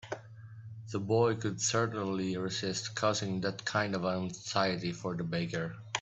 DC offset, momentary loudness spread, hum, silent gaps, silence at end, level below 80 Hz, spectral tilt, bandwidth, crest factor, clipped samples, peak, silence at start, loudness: under 0.1%; 12 LU; none; none; 0 s; -68 dBFS; -4.5 dB/octave; 8.4 kHz; 20 dB; under 0.1%; -12 dBFS; 0.05 s; -33 LUFS